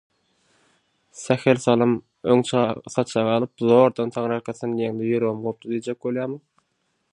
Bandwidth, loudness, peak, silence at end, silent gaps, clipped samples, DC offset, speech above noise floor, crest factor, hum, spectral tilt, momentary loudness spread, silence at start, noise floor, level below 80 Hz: 10.5 kHz; -22 LUFS; -2 dBFS; 0.75 s; none; under 0.1%; under 0.1%; 50 dB; 20 dB; none; -6 dB/octave; 10 LU; 1.15 s; -72 dBFS; -66 dBFS